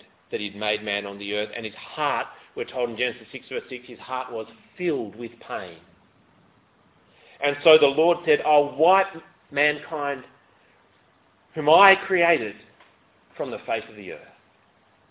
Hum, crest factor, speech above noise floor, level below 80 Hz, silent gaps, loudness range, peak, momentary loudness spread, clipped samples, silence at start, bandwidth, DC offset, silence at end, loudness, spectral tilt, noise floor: none; 24 dB; 37 dB; -66 dBFS; none; 12 LU; 0 dBFS; 20 LU; under 0.1%; 0.3 s; 4 kHz; under 0.1%; 0.85 s; -23 LUFS; -7.5 dB/octave; -61 dBFS